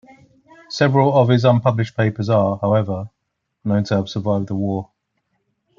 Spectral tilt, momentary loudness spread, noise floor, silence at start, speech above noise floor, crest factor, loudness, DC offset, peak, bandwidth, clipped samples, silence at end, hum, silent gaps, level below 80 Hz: -7.5 dB/octave; 13 LU; -75 dBFS; 0.7 s; 58 dB; 18 dB; -18 LUFS; under 0.1%; -2 dBFS; 7.4 kHz; under 0.1%; 0.95 s; none; none; -58 dBFS